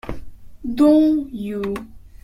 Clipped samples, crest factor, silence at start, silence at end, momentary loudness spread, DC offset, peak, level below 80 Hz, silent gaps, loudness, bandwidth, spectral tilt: under 0.1%; 14 dB; 0.05 s; 0.25 s; 20 LU; under 0.1%; -4 dBFS; -42 dBFS; none; -18 LUFS; 12 kHz; -7.5 dB/octave